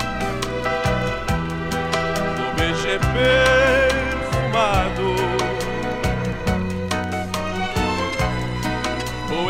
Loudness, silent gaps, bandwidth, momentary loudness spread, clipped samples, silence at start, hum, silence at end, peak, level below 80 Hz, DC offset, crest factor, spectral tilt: -21 LUFS; none; 16.5 kHz; 8 LU; under 0.1%; 0 s; none; 0 s; -4 dBFS; -32 dBFS; under 0.1%; 18 dB; -5 dB/octave